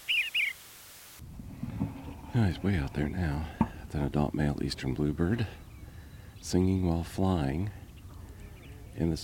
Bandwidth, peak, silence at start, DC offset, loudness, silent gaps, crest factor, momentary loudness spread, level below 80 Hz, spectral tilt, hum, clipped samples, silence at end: 17 kHz; -10 dBFS; 0 s; under 0.1%; -31 LUFS; none; 22 dB; 20 LU; -44 dBFS; -6 dB/octave; none; under 0.1%; 0 s